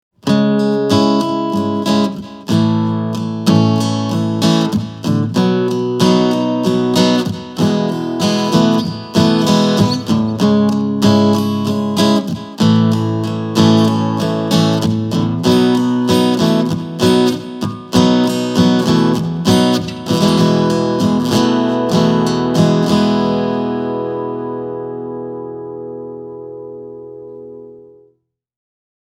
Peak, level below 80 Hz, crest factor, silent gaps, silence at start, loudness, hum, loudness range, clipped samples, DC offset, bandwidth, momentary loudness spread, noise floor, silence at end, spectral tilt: 0 dBFS; -48 dBFS; 14 dB; none; 0.25 s; -14 LUFS; none; 9 LU; under 0.1%; under 0.1%; 15.5 kHz; 12 LU; -60 dBFS; 1.25 s; -6 dB/octave